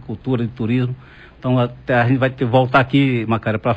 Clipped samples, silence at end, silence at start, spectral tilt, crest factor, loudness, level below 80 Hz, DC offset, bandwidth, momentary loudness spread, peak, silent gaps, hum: under 0.1%; 0 s; 0.05 s; -9 dB/octave; 16 dB; -18 LUFS; -46 dBFS; under 0.1%; 5.2 kHz; 8 LU; -2 dBFS; none; none